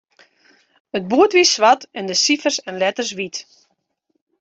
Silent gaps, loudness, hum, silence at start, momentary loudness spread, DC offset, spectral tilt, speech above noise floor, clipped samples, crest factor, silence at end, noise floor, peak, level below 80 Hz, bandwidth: none; -17 LUFS; none; 0.95 s; 15 LU; under 0.1%; -2 dB/octave; 53 dB; under 0.1%; 18 dB; 1 s; -71 dBFS; -2 dBFS; -66 dBFS; 8.2 kHz